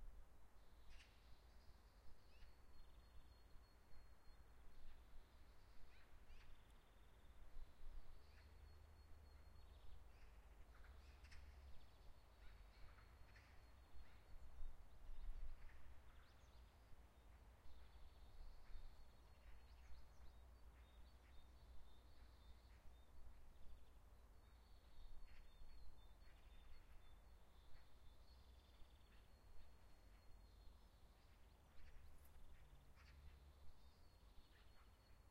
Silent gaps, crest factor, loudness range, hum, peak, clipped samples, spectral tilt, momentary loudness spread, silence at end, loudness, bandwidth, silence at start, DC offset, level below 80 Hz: none; 20 dB; 4 LU; none; -40 dBFS; under 0.1%; -5 dB/octave; 5 LU; 0 s; -68 LUFS; 15 kHz; 0 s; under 0.1%; -62 dBFS